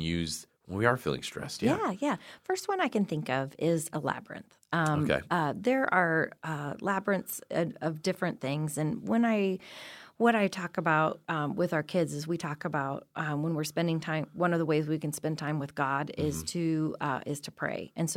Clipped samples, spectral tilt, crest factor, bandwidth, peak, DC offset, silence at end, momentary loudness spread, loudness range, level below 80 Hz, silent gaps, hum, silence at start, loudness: under 0.1%; -5.5 dB/octave; 22 dB; 16.5 kHz; -8 dBFS; under 0.1%; 0 s; 8 LU; 2 LU; -64 dBFS; none; none; 0 s; -31 LUFS